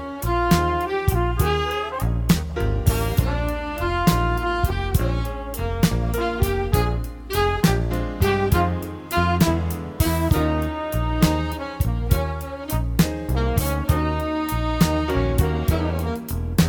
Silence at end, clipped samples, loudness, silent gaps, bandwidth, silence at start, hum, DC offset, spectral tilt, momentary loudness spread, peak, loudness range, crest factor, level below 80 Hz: 0 s; under 0.1%; -22 LUFS; none; 19 kHz; 0 s; none; under 0.1%; -6 dB/octave; 7 LU; -4 dBFS; 2 LU; 18 dB; -28 dBFS